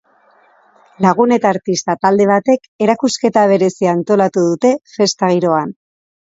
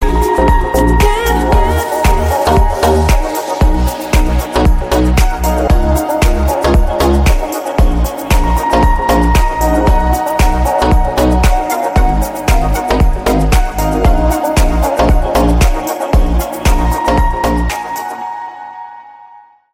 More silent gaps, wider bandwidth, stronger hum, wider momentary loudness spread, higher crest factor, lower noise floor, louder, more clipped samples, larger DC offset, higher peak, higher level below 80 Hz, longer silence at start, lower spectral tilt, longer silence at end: first, 2.68-2.79 s vs none; second, 8 kHz vs 17 kHz; neither; about the same, 5 LU vs 5 LU; about the same, 14 dB vs 10 dB; first, -52 dBFS vs -40 dBFS; about the same, -14 LUFS vs -13 LUFS; neither; neither; about the same, 0 dBFS vs 0 dBFS; second, -60 dBFS vs -14 dBFS; first, 1 s vs 0 s; about the same, -5.5 dB/octave vs -6 dB/octave; about the same, 0.55 s vs 0.6 s